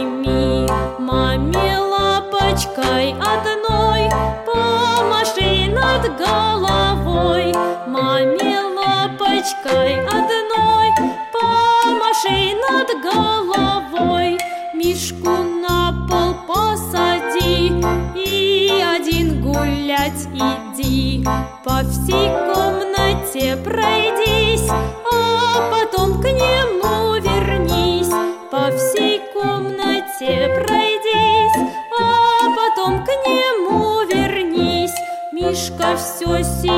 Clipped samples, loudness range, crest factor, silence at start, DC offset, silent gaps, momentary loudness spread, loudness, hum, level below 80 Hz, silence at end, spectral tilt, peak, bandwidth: under 0.1%; 3 LU; 14 dB; 0 s; under 0.1%; none; 5 LU; -17 LUFS; none; -30 dBFS; 0 s; -4.5 dB/octave; -2 dBFS; 16.5 kHz